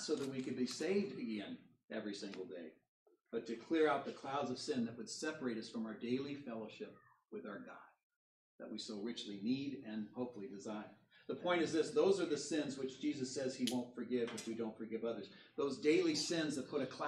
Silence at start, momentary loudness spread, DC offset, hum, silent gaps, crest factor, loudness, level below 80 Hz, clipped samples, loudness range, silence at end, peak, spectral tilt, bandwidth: 0 s; 16 LU; under 0.1%; none; 1.84-1.88 s, 2.88-3.06 s, 8.03-8.10 s, 8.16-8.59 s; 20 dB; -41 LUFS; -88 dBFS; under 0.1%; 8 LU; 0 s; -22 dBFS; -4.5 dB/octave; 12 kHz